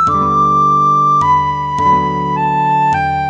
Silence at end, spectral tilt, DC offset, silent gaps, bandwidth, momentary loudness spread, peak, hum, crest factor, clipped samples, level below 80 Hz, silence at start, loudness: 0 s; -6.5 dB/octave; under 0.1%; none; 8.6 kHz; 5 LU; -2 dBFS; none; 10 dB; under 0.1%; -38 dBFS; 0 s; -12 LUFS